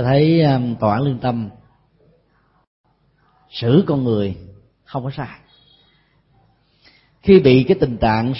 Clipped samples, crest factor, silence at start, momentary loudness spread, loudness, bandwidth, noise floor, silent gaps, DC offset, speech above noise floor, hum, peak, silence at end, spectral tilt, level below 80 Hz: under 0.1%; 18 dB; 0 s; 18 LU; -17 LUFS; 5.8 kHz; -60 dBFS; 2.67-2.84 s; under 0.1%; 44 dB; none; 0 dBFS; 0 s; -12 dB/octave; -44 dBFS